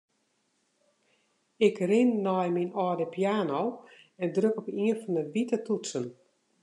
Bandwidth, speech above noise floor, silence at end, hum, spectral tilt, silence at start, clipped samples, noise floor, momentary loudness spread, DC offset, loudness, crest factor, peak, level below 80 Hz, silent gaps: 11 kHz; 46 dB; 0.5 s; none; -6 dB/octave; 1.6 s; under 0.1%; -74 dBFS; 10 LU; under 0.1%; -29 LUFS; 18 dB; -10 dBFS; -86 dBFS; none